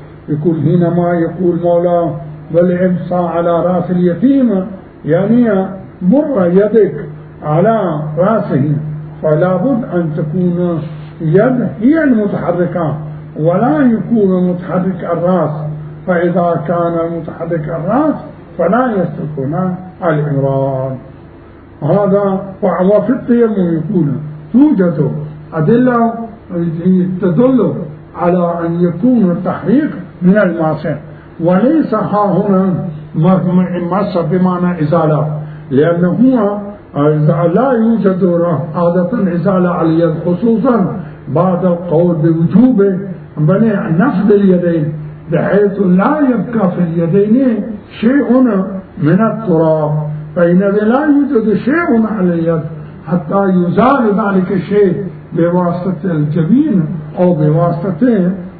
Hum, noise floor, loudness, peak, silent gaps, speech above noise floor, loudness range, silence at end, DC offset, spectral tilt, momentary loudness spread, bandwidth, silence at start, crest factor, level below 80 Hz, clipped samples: none; -36 dBFS; -13 LUFS; 0 dBFS; none; 24 dB; 3 LU; 0 s; under 0.1%; -13 dB/octave; 9 LU; 4.6 kHz; 0 s; 12 dB; -44 dBFS; under 0.1%